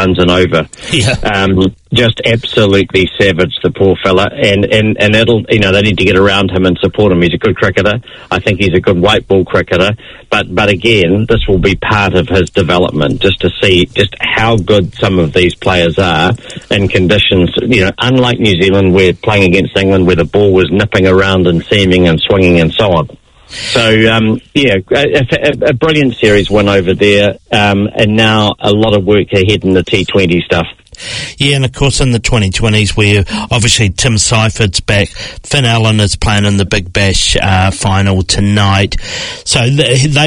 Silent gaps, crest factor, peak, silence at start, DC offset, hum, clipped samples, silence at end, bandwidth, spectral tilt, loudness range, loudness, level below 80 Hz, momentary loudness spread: none; 10 dB; 0 dBFS; 0 s; under 0.1%; none; 0.4%; 0 s; 11 kHz; -5 dB/octave; 2 LU; -9 LUFS; -28 dBFS; 4 LU